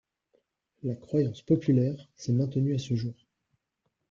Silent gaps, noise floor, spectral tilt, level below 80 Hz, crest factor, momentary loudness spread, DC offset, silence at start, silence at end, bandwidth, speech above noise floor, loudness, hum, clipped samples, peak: none; -80 dBFS; -8.5 dB/octave; -66 dBFS; 18 dB; 12 LU; under 0.1%; 0.85 s; 1 s; 7.4 kHz; 52 dB; -29 LUFS; none; under 0.1%; -12 dBFS